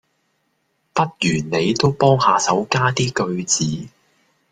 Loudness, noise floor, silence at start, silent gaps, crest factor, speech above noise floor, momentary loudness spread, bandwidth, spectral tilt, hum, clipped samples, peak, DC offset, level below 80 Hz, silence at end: -18 LUFS; -68 dBFS; 0.95 s; none; 18 dB; 50 dB; 7 LU; 9.6 kHz; -4 dB/octave; none; under 0.1%; -2 dBFS; under 0.1%; -54 dBFS; 0.65 s